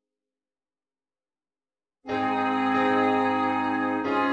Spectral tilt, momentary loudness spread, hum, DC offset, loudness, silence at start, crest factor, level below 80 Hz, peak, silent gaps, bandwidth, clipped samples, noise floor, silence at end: -6 dB/octave; 5 LU; none; under 0.1%; -25 LUFS; 2.05 s; 16 dB; -68 dBFS; -12 dBFS; none; 8 kHz; under 0.1%; under -90 dBFS; 0 s